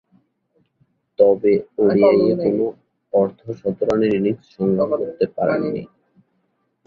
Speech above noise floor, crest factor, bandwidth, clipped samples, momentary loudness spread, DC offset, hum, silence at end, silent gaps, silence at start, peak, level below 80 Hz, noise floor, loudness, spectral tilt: 50 dB; 18 dB; 6.8 kHz; under 0.1%; 11 LU; under 0.1%; none; 1 s; none; 1.2 s; -2 dBFS; -56 dBFS; -68 dBFS; -19 LUFS; -9 dB/octave